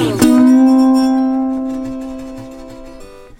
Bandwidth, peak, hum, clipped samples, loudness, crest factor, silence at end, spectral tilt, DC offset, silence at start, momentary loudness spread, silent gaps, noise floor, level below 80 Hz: 16.5 kHz; 0 dBFS; none; under 0.1%; -12 LUFS; 14 dB; 0.15 s; -5.5 dB/octave; under 0.1%; 0 s; 23 LU; none; -35 dBFS; -40 dBFS